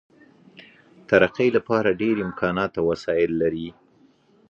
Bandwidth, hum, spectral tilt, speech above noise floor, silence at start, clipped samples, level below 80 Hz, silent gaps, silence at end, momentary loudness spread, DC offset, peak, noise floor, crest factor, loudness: 7.6 kHz; none; -7 dB/octave; 36 dB; 0.6 s; under 0.1%; -54 dBFS; none; 0.8 s; 6 LU; under 0.1%; -2 dBFS; -58 dBFS; 22 dB; -22 LUFS